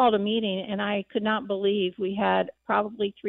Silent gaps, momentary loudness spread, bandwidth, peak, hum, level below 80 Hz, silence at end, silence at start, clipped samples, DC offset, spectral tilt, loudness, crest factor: none; 4 LU; 4.2 kHz; -10 dBFS; none; -66 dBFS; 0 s; 0 s; under 0.1%; under 0.1%; -9 dB/octave; -26 LUFS; 14 dB